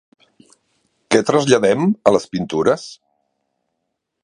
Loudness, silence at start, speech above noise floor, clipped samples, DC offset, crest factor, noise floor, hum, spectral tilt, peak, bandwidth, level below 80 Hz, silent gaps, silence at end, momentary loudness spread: -17 LUFS; 1.1 s; 60 dB; under 0.1%; under 0.1%; 20 dB; -76 dBFS; none; -5 dB/octave; 0 dBFS; 11 kHz; -56 dBFS; none; 1.3 s; 9 LU